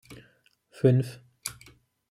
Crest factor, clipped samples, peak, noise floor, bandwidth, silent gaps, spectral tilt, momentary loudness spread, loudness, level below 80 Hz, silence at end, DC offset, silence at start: 22 dB; under 0.1%; -8 dBFS; -64 dBFS; 16 kHz; none; -7 dB/octave; 15 LU; -28 LUFS; -66 dBFS; 0.6 s; under 0.1%; 0.1 s